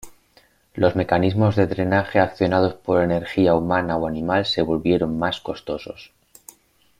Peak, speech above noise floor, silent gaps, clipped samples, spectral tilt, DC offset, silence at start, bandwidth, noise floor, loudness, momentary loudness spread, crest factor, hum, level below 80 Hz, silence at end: -2 dBFS; 37 dB; none; under 0.1%; -7 dB/octave; under 0.1%; 0.05 s; 16 kHz; -57 dBFS; -21 LUFS; 11 LU; 18 dB; none; -50 dBFS; 0.95 s